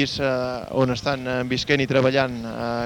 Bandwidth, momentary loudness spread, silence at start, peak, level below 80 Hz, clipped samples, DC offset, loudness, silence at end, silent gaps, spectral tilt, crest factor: 17 kHz; 7 LU; 0 s; -4 dBFS; -48 dBFS; under 0.1%; under 0.1%; -22 LUFS; 0 s; none; -5.5 dB/octave; 20 dB